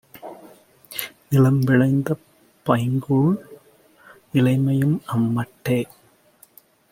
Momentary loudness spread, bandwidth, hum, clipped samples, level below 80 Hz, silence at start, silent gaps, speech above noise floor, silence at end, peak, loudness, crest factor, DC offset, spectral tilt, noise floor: 14 LU; 16.5 kHz; none; under 0.1%; -60 dBFS; 0.15 s; none; 36 dB; 1.1 s; -2 dBFS; -21 LUFS; 20 dB; under 0.1%; -7.5 dB/octave; -55 dBFS